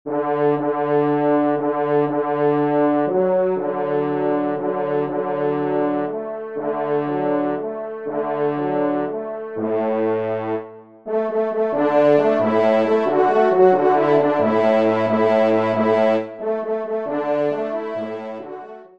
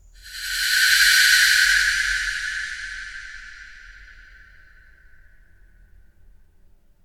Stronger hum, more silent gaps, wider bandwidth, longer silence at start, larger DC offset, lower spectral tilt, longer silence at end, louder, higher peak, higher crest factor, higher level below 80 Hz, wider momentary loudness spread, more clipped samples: neither; neither; second, 6.6 kHz vs 19 kHz; second, 0.05 s vs 0.25 s; first, 0.2% vs under 0.1%; first, -8.5 dB/octave vs 4 dB/octave; second, 0.1 s vs 3 s; second, -20 LUFS vs -17 LUFS; about the same, -2 dBFS vs -4 dBFS; about the same, 16 dB vs 20 dB; second, -70 dBFS vs -46 dBFS; second, 10 LU vs 24 LU; neither